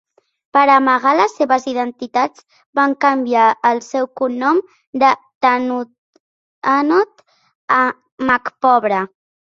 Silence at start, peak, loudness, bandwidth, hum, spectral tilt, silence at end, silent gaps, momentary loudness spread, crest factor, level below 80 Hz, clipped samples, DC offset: 0.55 s; -2 dBFS; -16 LUFS; 7.6 kHz; none; -4.5 dB/octave; 0.4 s; 2.66-2.73 s, 4.87-4.93 s, 5.35-5.41 s, 5.98-6.13 s, 6.20-6.62 s, 7.55-7.68 s, 8.12-8.18 s; 9 LU; 16 dB; -62 dBFS; under 0.1%; under 0.1%